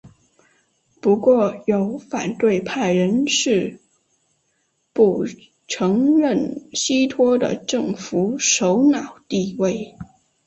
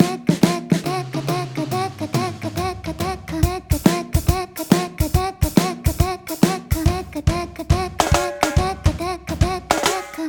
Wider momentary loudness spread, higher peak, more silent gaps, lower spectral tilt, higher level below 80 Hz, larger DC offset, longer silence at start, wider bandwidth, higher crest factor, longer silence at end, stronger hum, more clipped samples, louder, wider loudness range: about the same, 9 LU vs 7 LU; second, -4 dBFS vs 0 dBFS; neither; about the same, -4.5 dB/octave vs -5.5 dB/octave; second, -60 dBFS vs -30 dBFS; neither; about the same, 0.05 s vs 0 s; second, 8.4 kHz vs over 20 kHz; about the same, 16 dB vs 20 dB; first, 0.45 s vs 0 s; neither; neither; about the same, -19 LUFS vs -21 LUFS; about the same, 3 LU vs 3 LU